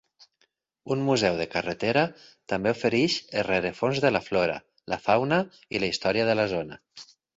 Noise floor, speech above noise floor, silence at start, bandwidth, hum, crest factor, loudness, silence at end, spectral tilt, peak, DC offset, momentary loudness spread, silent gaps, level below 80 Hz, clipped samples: -71 dBFS; 45 dB; 0.85 s; 8 kHz; none; 20 dB; -26 LUFS; 0.35 s; -5 dB/octave; -8 dBFS; under 0.1%; 9 LU; none; -58 dBFS; under 0.1%